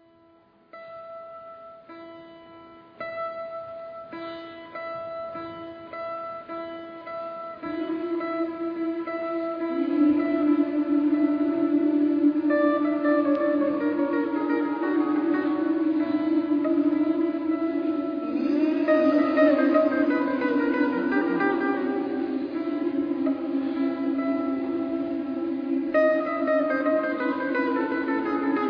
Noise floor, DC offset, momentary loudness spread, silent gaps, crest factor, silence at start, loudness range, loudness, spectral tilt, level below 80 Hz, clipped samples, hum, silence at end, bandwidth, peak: -58 dBFS; under 0.1%; 15 LU; none; 18 dB; 0.75 s; 13 LU; -25 LUFS; -8 dB/octave; -68 dBFS; under 0.1%; none; 0 s; 5.2 kHz; -8 dBFS